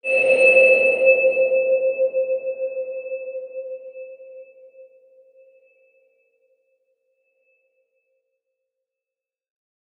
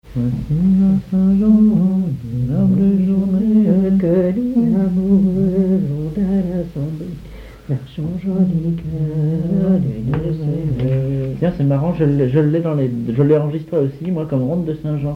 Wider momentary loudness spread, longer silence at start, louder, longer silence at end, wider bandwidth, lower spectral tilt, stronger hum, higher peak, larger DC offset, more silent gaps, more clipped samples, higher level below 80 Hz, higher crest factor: first, 22 LU vs 9 LU; about the same, 0.05 s vs 0.05 s; about the same, -17 LUFS vs -17 LUFS; first, 5.15 s vs 0 s; first, 9.4 kHz vs 4.6 kHz; second, -3 dB/octave vs -11 dB/octave; neither; about the same, -4 dBFS vs -2 dBFS; neither; neither; neither; second, -82 dBFS vs -38 dBFS; first, 20 dB vs 14 dB